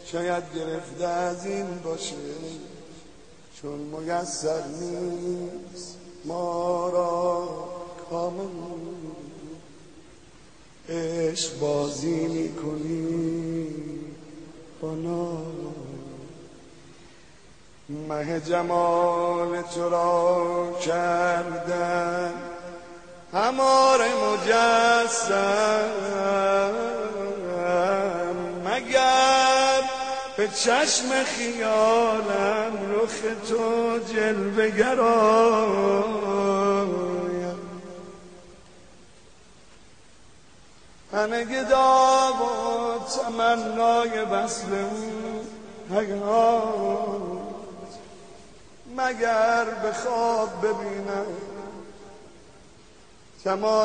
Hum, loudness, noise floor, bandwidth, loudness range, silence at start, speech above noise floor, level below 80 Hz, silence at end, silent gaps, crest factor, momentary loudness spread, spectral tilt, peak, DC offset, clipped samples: none; -24 LUFS; -54 dBFS; 9.8 kHz; 12 LU; 0 s; 30 dB; -60 dBFS; 0 s; none; 18 dB; 19 LU; -3.5 dB/octave; -8 dBFS; 0.3%; under 0.1%